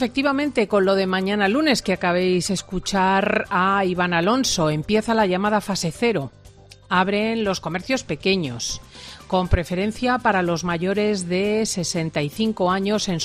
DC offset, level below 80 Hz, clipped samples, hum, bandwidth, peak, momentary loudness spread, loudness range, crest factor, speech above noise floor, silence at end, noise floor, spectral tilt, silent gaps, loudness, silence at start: under 0.1%; -40 dBFS; under 0.1%; none; 14 kHz; -4 dBFS; 6 LU; 3 LU; 16 dB; 25 dB; 0 s; -46 dBFS; -4.5 dB/octave; none; -21 LUFS; 0 s